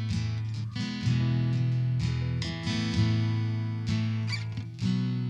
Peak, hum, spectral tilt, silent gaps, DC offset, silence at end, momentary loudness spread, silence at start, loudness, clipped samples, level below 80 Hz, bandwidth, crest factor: -14 dBFS; none; -6.5 dB/octave; none; under 0.1%; 0 s; 6 LU; 0 s; -29 LUFS; under 0.1%; -48 dBFS; 9 kHz; 14 dB